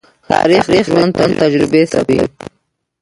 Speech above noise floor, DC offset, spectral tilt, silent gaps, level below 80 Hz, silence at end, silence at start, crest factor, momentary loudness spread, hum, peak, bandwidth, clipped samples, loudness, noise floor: 53 dB; under 0.1%; -6 dB/octave; none; -44 dBFS; 0.55 s; 0.3 s; 14 dB; 5 LU; none; 0 dBFS; 11.5 kHz; under 0.1%; -12 LUFS; -65 dBFS